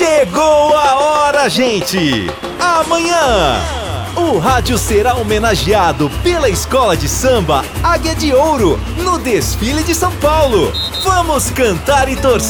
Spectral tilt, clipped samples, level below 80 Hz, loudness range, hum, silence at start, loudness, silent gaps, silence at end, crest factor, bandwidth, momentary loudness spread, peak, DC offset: -4 dB/octave; under 0.1%; -26 dBFS; 2 LU; none; 0 s; -13 LUFS; none; 0 s; 12 dB; over 20 kHz; 5 LU; 0 dBFS; under 0.1%